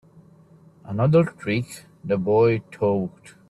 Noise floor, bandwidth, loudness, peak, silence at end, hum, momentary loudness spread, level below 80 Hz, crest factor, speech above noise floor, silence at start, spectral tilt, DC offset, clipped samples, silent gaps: -52 dBFS; 12.5 kHz; -22 LUFS; -8 dBFS; 0.2 s; none; 14 LU; -58 dBFS; 16 dB; 30 dB; 0.85 s; -8 dB/octave; under 0.1%; under 0.1%; none